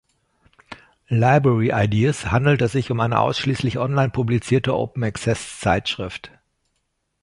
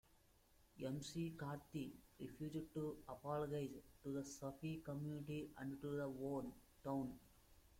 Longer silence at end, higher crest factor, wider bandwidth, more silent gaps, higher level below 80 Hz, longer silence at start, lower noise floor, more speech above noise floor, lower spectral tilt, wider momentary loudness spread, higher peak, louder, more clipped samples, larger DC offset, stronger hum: first, 0.95 s vs 0 s; about the same, 18 dB vs 16 dB; second, 11.5 kHz vs 16.5 kHz; neither; first, -44 dBFS vs -72 dBFS; first, 0.7 s vs 0.15 s; about the same, -73 dBFS vs -74 dBFS; first, 53 dB vs 25 dB; about the same, -6.5 dB/octave vs -6.5 dB/octave; about the same, 8 LU vs 7 LU; first, -2 dBFS vs -34 dBFS; first, -20 LUFS vs -49 LUFS; neither; neither; neither